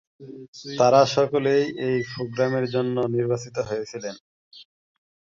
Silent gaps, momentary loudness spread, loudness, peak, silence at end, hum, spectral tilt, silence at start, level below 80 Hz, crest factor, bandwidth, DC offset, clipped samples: 0.48-0.53 s, 4.20-4.51 s; 18 LU; -23 LUFS; -4 dBFS; 0.75 s; none; -5.5 dB/octave; 0.2 s; -64 dBFS; 20 dB; 7.6 kHz; under 0.1%; under 0.1%